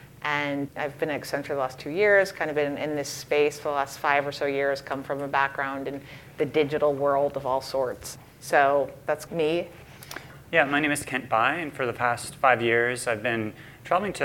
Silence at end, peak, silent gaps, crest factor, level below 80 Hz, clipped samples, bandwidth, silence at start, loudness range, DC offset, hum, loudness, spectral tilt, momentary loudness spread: 0 s; -6 dBFS; none; 20 dB; -60 dBFS; under 0.1%; 18 kHz; 0 s; 2 LU; under 0.1%; none; -26 LUFS; -4.5 dB/octave; 12 LU